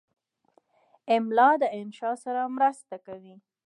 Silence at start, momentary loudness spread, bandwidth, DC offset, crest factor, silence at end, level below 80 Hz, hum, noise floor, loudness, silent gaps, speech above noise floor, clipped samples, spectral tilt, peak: 1.05 s; 23 LU; 11 kHz; under 0.1%; 20 dB; 0.35 s; -84 dBFS; none; -67 dBFS; -25 LUFS; none; 42 dB; under 0.1%; -5 dB/octave; -8 dBFS